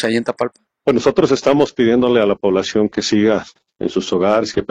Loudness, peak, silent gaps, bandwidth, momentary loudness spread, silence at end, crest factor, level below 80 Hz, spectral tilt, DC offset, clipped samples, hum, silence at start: -16 LUFS; -2 dBFS; none; 9.8 kHz; 8 LU; 0.05 s; 14 dB; -50 dBFS; -5.5 dB/octave; under 0.1%; under 0.1%; none; 0 s